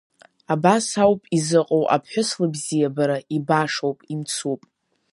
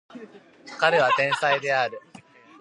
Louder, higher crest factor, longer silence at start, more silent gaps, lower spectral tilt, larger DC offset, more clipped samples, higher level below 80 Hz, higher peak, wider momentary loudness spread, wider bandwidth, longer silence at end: about the same, -21 LUFS vs -22 LUFS; about the same, 20 dB vs 20 dB; first, 0.5 s vs 0.15 s; neither; first, -5 dB/octave vs -3.5 dB/octave; neither; neither; first, -64 dBFS vs -78 dBFS; about the same, -2 dBFS vs -4 dBFS; second, 8 LU vs 16 LU; about the same, 11.5 kHz vs 11.5 kHz; about the same, 0.55 s vs 0.6 s